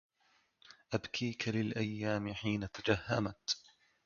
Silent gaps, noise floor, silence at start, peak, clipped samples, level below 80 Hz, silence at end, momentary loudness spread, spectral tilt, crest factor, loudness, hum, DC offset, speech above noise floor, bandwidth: none; -74 dBFS; 0.7 s; -16 dBFS; under 0.1%; -62 dBFS; 0.45 s; 4 LU; -4.5 dB/octave; 22 dB; -37 LUFS; none; under 0.1%; 37 dB; 7 kHz